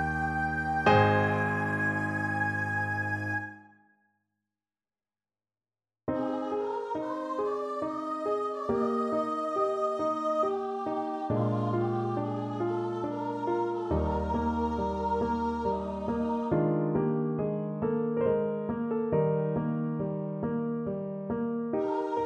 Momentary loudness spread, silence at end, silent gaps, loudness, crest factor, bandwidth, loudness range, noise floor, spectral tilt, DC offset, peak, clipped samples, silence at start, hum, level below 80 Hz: 6 LU; 0 s; none; -30 LUFS; 20 dB; 10.5 kHz; 7 LU; under -90 dBFS; -8 dB/octave; under 0.1%; -10 dBFS; under 0.1%; 0 s; none; -50 dBFS